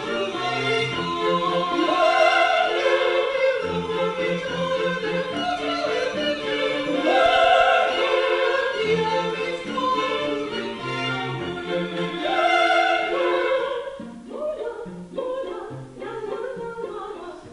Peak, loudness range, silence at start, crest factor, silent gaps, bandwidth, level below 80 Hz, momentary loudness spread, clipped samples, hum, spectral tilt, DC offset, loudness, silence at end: -6 dBFS; 7 LU; 0 s; 18 dB; none; 11 kHz; -56 dBFS; 14 LU; under 0.1%; none; -4.5 dB/octave; under 0.1%; -22 LUFS; 0 s